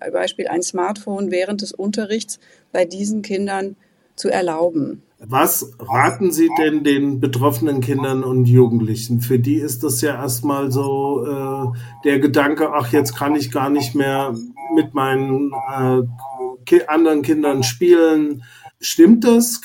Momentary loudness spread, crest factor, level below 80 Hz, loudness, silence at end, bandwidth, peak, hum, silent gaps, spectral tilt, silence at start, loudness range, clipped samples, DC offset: 11 LU; 16 dB; -60 dBFS; -17 LUFS; 0.05 s; 17 kHz; -2 dBFS; none; none; -5.5 dB/octave; 0 s; 6 LU; under 0.1%; under 0.1%